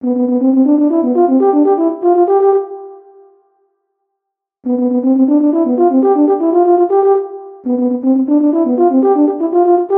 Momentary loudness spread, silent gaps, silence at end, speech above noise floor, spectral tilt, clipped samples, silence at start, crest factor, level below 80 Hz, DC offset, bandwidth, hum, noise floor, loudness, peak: 6 LU; none; 0 s; 67 dB; -11 dB/octave; under 0.1%; 0 s; 10 dB; -74 dBFS; under 0.1%; 2.5 kHz; none; -77 dBFS; -12 LUFS; -2 dBFS